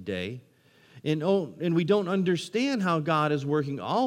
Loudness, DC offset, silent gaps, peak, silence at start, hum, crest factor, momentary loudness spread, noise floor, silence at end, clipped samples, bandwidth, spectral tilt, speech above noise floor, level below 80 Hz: -27 LUFS; under 0.1%; none; -10 dBFS; 0 s; none; 16 dB; 9 LU; -56 dBFS; 0 s; under 0.1%; 12.5 kHz; -6.5 dB/octave; 30 dB; -72 dBFS